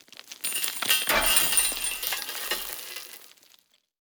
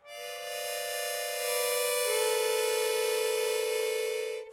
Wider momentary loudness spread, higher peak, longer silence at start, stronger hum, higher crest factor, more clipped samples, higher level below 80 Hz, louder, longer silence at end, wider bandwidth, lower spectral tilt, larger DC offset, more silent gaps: first, 18 LU vs 7 LU; first, -2 dBFS vs -16 dBFS; first, 0.25 s vs 0.05 s; neither; first, 28 dB vs 14 dB; neither; first, -52 dBFS vs -84 dBFS; first, -24 LUFS vs -30 LUFS; first, 0.75 s vs 0 s; first, over 20 kHz vs 16 kHz; about the same, 1 dB/octave vs 2 dB/octave; neither; neither